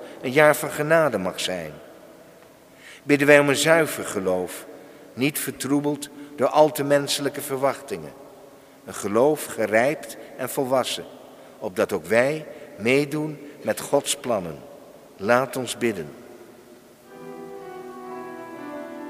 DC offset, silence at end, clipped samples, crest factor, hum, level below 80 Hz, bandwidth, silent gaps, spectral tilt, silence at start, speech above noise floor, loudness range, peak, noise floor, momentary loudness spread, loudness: under 0.1%; 0 s; under 0.1%; 24 dB; none; -66 dBFS; 16 kHz; none; -4 dB/octave; 0 s; 27 dB; 7 LU; 0 dBFS; -49 dBFS; 20 LU; -22 LUFS